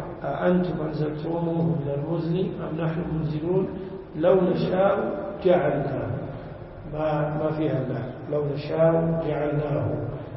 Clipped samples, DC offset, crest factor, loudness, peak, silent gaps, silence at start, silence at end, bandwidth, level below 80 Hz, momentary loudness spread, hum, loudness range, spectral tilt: under 0.1%; under 0.1%; 18 dB; -25 LUFS; -8 dBFS; none; 0 s; 0 s; 5.8 kHz; -48 dBFS; 10 LU; none; 3 LU; -12.5 dB/octave